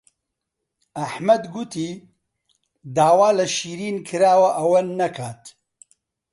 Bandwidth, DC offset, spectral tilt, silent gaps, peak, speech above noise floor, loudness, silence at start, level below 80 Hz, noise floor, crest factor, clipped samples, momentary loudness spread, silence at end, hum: 11.5 kHz; under 0.1%; -4.5 dB/octave; none; -4 dBFS; 61 dB; -20 LUFS; 0.95 s; -66 dBFS; -81 dBFS; 18 dB; under 0.1%; 16 LU; 0.8 s; none